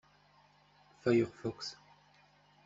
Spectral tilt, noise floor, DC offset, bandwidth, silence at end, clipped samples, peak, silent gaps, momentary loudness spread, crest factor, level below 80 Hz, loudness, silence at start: -6 dB/octave; -66 dBFS; under 0.1%; 7.6 kHz; 0.9 s; under 0.1%; -18 dBFS; none; 14 LU; 22 dB; -72 dBFS; -35 LUFS; 1.05 s